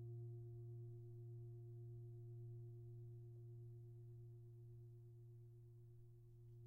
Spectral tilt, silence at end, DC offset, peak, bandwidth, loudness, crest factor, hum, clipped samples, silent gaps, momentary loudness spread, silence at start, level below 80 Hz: -10.5 dB/octave; 0 s; under 0.1%; -48 dBFS; 1.2 kHz; -59 LUFS; 10 dB; none; under 0.1%; none; 8 LU; 0 s; -76 dBFS